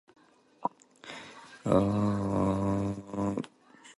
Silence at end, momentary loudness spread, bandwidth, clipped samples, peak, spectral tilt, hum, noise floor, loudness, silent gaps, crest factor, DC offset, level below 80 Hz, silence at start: 0.05 s; 18 LU; 11.5 kHz; under 0.1%; -10 dBFS; -8 dB/octave; none; -56 dBFS; -31 LUFS; none; 22 dB; under 0.1%; -52 dBFS; 0.6 s